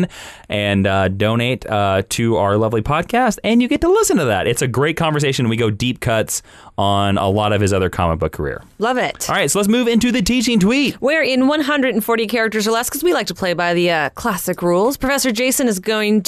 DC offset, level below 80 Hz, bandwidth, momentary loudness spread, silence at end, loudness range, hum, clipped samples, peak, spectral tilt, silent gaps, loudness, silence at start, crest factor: under 0.1%; -40 dBFS; 14 kHz; 5 LU; 0.05 s; 2 LU; none; under 0.1%; -6 dBFS; -4.5 dB/octave; none; -17 LUFS; 0 s; 10 dB